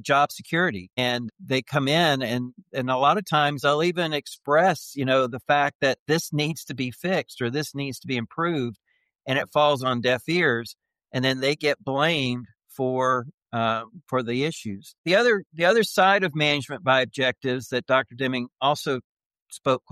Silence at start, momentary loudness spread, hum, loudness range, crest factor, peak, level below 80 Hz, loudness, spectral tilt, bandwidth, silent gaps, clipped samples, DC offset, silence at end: 0.05 s; 10 LU; none; 4 LU; 18 dB; -8 dBFS; -66 dBFS; -24 LUFS; -5 dB/octave; 15 kHz; 5.75-5.80 s, 5.99-6.06 s, 13.34-13.38 s, 14.98-15.04 s, 15.46-15.50 s, 19.04-19.17 s, 19.26-19.30 s, 19.42-19.46 s; under 0.1%; under 0.1%; 0.15 s